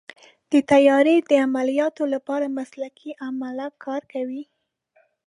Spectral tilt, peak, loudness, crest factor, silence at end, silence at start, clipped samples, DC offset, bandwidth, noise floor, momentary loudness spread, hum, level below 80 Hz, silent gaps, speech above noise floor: -5 dB/octave; -4 dBFS; -21 LUFS; 18 dB; 0.85 s; 0.5 s; under 0.1%; under 0.1%; 11 kHz; -64 dBFS; 17 LU; none; -68 dBFS; none; 43 dB